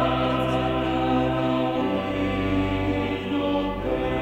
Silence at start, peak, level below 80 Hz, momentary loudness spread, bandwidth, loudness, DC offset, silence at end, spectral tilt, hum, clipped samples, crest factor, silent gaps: 0 s; -10 dBFS; -38 dBFS; 3 LU; 16 kHz; -24 LUFS; under 0.1%; 0 s; -7.5 dB/octave; none; under 0.1%; 14 dB; none